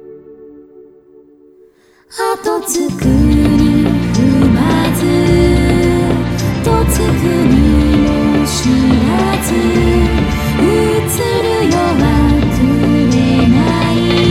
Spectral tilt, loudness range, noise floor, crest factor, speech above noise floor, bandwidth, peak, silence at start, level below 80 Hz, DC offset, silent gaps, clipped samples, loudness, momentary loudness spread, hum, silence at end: -6 dB/octave; 3 LU; -46 dBFS; 12 dB; 33 dB; 16.5 kHz; 0 dBFS; 0.05 s; -22 dBFS; under 0.1%; none; under 0.1%; -12 LUFS; 5 LU; none; 0 s